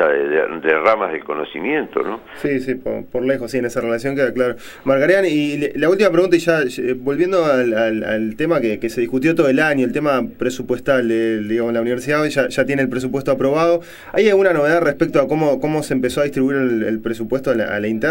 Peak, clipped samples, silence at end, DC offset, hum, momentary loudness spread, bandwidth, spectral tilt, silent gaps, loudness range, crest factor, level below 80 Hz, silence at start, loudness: -2 dBFS; under 0.1%; 0 s; under 0.1%; none; 8 LU; 16.5 kHz; -6 dB/octave; none; 3 LU; 16 dB; -48 dBFS; 0 s; -18 LUFS